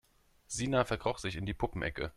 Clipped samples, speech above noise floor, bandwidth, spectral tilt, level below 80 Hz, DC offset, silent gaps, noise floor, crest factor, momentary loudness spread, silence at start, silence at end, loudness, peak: under 0.1%; 25 dB; 15 kHz; -4.5 dB/octave; -50 dBFS; under 0.1%; none; -59 dBFS; 20 dB; 7 LU; 0.5 s; 0.05 s; -35 LUFS; -16 dBFS